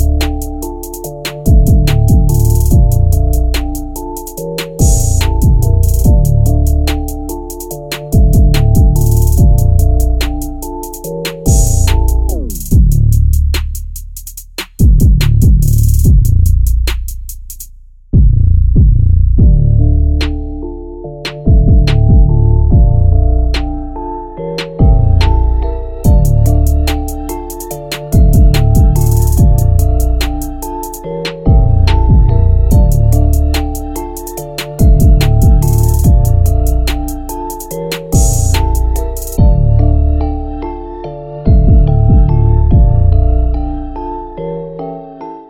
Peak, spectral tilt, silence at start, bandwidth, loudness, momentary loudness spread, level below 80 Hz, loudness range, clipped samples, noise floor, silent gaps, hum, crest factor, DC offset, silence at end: 0 dBFS; -6.5 dB/octave; 0 s; 17 kHz; -12 LUFS; 14 LU; -12 dBFS; 2 LU; under 0.1%; -35 dBFS; none; none; 10 dB; under 0.1%; 0.05 s